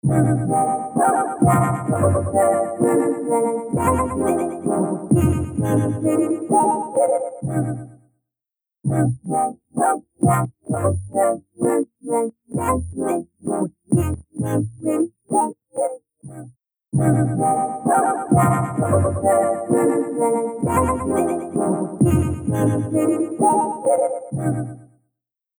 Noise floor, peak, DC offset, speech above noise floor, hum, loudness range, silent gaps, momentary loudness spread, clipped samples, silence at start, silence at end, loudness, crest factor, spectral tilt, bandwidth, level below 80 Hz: -89 dBFS; -4 dBFS; under 0.1%; 69 dB; none; 4 LU; none; 7 LU; under 0.1%; 0.05 s; 0.75 s; -20 LUFS; 16 dB; -8 dB/octave; over 20 kHz; -42 dBFS